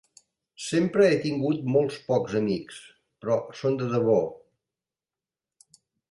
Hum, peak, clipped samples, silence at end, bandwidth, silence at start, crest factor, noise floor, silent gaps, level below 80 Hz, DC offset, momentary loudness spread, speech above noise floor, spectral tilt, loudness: none; -8 dBFS; under 0.1%; 1.75 s; 11.5 kHz; 0.6 s; 18 dB; under -90 dBFS; none; -66 dBFS; under 0.1%; 14 LU; over 65 dB; -6.5 dB/octave; -25 LUFS